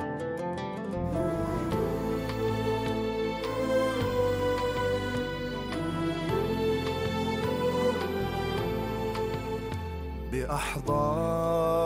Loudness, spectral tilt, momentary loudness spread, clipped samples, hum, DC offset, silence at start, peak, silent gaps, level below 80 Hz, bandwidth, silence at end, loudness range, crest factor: -30 LUFS; -6 dB/octave; 6 LU; under 0.1%; none; under 0.1%; 0 s; -14 dBFS; none; -44 dBFS; 16 kHz; 0 s; 2 LU; 14 dB